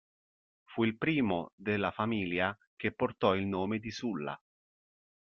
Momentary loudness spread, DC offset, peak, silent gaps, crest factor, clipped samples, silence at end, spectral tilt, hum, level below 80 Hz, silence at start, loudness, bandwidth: 8 LU; under 0.1%; -12 dBFS; 1.52-1.58 s, 2.67-2.77 s; 22 dB; under 0.1%; 0.95 s; -4.5 dB/octave; none; -68 dBFS; 0.7 s; -33 LUFS; 7 kHz